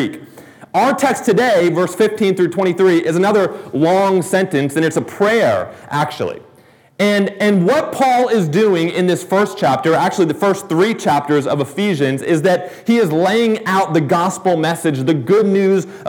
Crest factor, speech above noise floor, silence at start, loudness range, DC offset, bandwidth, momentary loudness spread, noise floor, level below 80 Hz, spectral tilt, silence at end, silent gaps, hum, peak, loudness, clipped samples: 12 dB; 33 dB; 0 s; 2 LU; under 0.1%; 19 kHz; 5 LU; -48 dBFS; -64 dBFS; -6 dB/octave; 0 s; none; none; -2 dBFS; -15 LUFS; under 0.1%